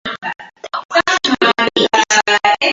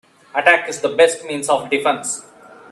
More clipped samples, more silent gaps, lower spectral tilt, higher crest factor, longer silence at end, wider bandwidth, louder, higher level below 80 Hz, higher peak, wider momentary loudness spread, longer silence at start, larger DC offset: neither; first, 0.85-0.89 s vs none; about the same, -1.5 dB/octave vs -2 dB/octave; about the same, 16 dB vs 18 dB; second, 0 s vs 0.15 s; second, 8 kHz vs 13 kHz; first, -13 LUFS vs -17 LUFS; first, -54 dBFS vs -68 dBFS; about the same, 0 dBFS vs 0 dBFS; first, 14 LU vs 11 LU; second, 0.05 s vs 0.35 s; neither